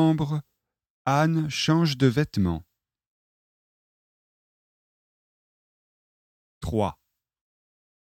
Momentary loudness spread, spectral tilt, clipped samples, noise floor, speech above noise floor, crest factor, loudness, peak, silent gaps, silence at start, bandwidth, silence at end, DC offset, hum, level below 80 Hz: 11 LU; -6.5 dB/octave; under 0.1%; under -90 dBFS; over 67 dB; 22 dB; -25 LUFS; -8 dBFS; 0.90-1.05 s, 3.07-6.61 s; 0 s; 14 kHz; 1.2 s; under 0.1%; none; -52 dBFS